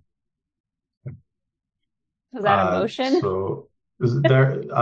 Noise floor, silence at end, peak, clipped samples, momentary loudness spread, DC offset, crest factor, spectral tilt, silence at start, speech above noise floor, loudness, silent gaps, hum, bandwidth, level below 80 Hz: -82 dBFS; 0 s; -2 dBFS; under 0.1%; 23 LU; under 0.1%; 20 dB; -7.5 dB/octave; 1.05 s; 62 dB; -21 LUFS; none; none; 7.4 kHz; -64 dBFS